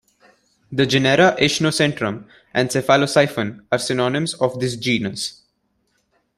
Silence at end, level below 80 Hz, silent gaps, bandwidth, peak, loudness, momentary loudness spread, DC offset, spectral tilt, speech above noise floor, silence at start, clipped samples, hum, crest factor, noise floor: 1.05 s; -56 dBFS; none; 15 kHz; -2 dBFS; -19 LUFS; 11 LU; under 0.1%; -4.5 dB/octave; 49 dB; 0.7 s; under 0.1%; none; 18 dB; -68 dBFS